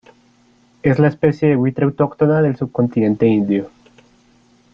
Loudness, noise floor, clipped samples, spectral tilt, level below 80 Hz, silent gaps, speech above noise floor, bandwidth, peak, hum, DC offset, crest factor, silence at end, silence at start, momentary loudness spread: -16 LUFS; -54 dBFS; under 0.1%; -10 dB/octave; -52 dBFS; none; 38 dB; 6.4 kHz; -2 dBFS; none; under 0.1%; 16 dB; 1.05 s; 0.85 s; 5 LU